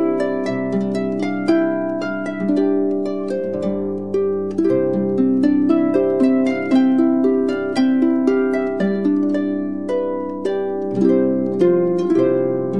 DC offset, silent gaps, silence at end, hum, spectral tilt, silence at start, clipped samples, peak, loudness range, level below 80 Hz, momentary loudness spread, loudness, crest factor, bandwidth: 0.7%; none; 0 s; none; -8 dB/octave; 0 s; under 0.1%; -4 dBFS; 4 LU; -64 dBFS; 7 LU; -18 LUFS; 14 dB; 10 kHz